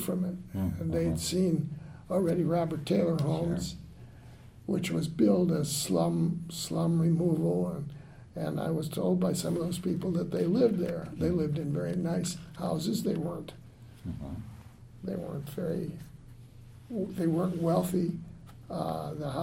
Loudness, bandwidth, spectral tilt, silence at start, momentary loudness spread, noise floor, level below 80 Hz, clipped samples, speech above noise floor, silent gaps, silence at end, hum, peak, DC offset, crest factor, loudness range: -31 LUFS; 16 kHz; -6.5 dB/octave; 0 s; 16 LU; -50 dBFS; -56 dBFS; under 0.1%; 21 dB; none; 0 s; none; -12 dBFS; under 0.1%; 18 dB; 8 LU